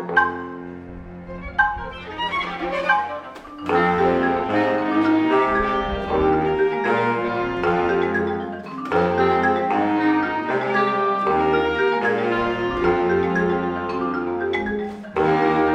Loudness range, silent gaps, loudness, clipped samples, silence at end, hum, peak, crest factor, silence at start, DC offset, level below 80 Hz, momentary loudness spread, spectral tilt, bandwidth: 3 LU; none; -21 LUFS; under 0.1%; 0 s; none; -4 dBFS; 16 dB; 0 s; under 0.1%; -44 dBFS; 12 LU; -7 dB/octave; 8.6 kHz